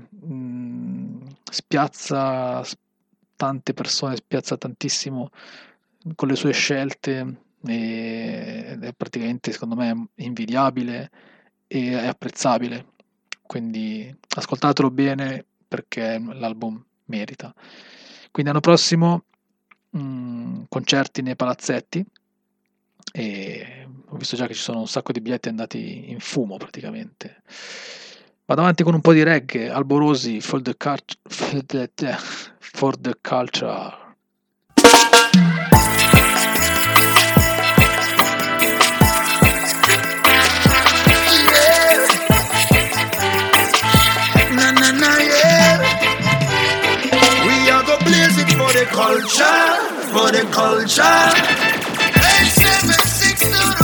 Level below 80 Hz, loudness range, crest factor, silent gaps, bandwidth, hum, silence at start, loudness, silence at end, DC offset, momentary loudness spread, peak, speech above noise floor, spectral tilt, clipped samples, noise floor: -38 dBFS; 15 LU; 18 dB; none; 19.5 kHz; none; 0.25 s; -15 LUFS; 0 s; under 0.1%; 20 LU; 0 dBFS; 52 dB; -3.5 dB/octave; under 0.1%; -73 dBFS